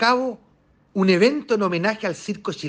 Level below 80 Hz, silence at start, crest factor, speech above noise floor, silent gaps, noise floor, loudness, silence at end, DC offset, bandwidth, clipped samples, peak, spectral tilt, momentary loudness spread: -64 dBFS; 0 s; 18 dB; 38 dB; none; -59 dBFS; -21 LUFS; 0 s; under 0.1%; 9.4 kHz; under 0.1%; -4 dBFS; -5.5 dB/octave; 13 LU